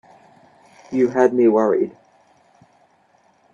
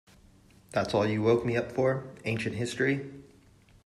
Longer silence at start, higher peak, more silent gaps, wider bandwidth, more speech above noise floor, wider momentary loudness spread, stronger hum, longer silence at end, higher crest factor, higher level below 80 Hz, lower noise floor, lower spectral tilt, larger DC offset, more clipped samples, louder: first, 0.9 s vs 0.75 s; first, -2 dBFS vs -12 dBFS; neither; second, 7.2 kHz vs 13 kHz; first, 42 dB vs 30 dB; first, 11 LU vs 8 LU; neither; first, 1.65 s vs 0.65 s; about the same, 20 dB vs 18 dB; second, -68 dBFS vs -60 dBFS; about the same, -58 dBFS vs -59 dBFS; about the same, -7.5 dB/octave vs -6.5 dB/octave; neither; neither; first, -18 LUFS vs -29 LUFS